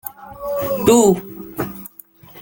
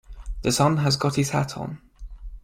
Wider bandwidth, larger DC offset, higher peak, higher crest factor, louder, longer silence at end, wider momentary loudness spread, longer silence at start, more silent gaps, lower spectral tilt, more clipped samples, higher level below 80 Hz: about the same, 17 kHz vs 16.5 kHz; neither; first, 0 dBFS vs -6 dBFS; about the same, 18 dB vs 20 dB; first, -17 LUFS vs -23 LUFS; about the same, 0 s vs 0.05 s; about the same, 20 LU vs 21 LU; about the same, 0.05 s vs 0.1 s; neither; about the same, -5 dB/octave vs -5 dB/octave; neither; second, -50 dBFS vs -40 dBFS